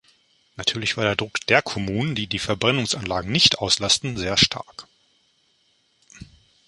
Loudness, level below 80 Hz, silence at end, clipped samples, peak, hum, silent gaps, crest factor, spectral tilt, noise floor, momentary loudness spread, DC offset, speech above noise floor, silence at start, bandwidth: -21 LUFS; -48 dBFS; 0.45 s; under 0.1%; 0 dBFS; none; none; 24 dB; -3 dB/octave; -65 dBFS; 9 LU; under 0.1%; 42 dB; 0.6 s; 11.5 kHz